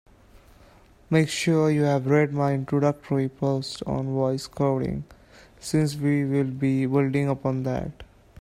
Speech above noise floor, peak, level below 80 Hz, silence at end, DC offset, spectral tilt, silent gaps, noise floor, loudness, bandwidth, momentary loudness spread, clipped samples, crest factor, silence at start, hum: 30 dB; -8 dBFS; -52 dBFS; 0.35 s; under 0.1%; -7 dB/octave; none; -53 dBFS; -24 LUFS; 13 kHz; 8 LU; under 0.1%; 18 dB; 1.1 s; none